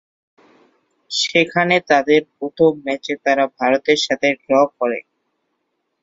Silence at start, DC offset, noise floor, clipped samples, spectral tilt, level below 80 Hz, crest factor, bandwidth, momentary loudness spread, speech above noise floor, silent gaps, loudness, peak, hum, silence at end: 1.1 s; under 0.1%; -72 dBFS; under 0.1%; -4 dB/octave; -62 dBFS; 18 dB; 7.8 kHz; 9 LU; 55 dB; none; -17 LUFS; 0 dBFS; none; 1 s